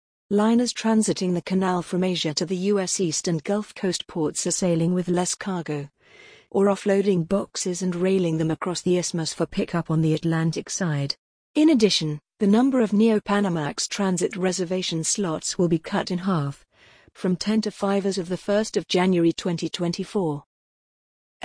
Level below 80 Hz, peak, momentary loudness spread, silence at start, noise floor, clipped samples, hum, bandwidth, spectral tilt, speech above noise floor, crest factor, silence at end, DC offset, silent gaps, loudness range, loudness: -58 dBFS; -6 dBFS; 7 LU; 0.3 s; -55 dBFS; under 0.1%; none; 10.5 kHz; -5 dB/octave; 32 dB; 16 dB; 1.05 s; under 0.1%; 11.18-11.54 s; 4 LU; -23 LUFS